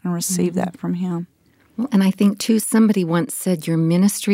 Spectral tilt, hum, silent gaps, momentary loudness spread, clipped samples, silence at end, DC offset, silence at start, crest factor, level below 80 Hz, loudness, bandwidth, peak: -5.5 dB/octave; none; none; 10 LU; under 0.1%; 0 s; under 0.1%; 0.05 s; 14 dB; -64 dBFS; -19 LUFS; 16 kHz; -4 dBFS